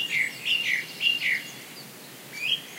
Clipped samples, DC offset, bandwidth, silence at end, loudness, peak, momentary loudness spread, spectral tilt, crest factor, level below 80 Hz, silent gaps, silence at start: under 0.1%; under 0.1%; 16 kHz; 0 s; -25 LUFS; -12 dBFS; 18 LU; 0 dB/octave; 18 dB; -86 dBFS; none; 0 s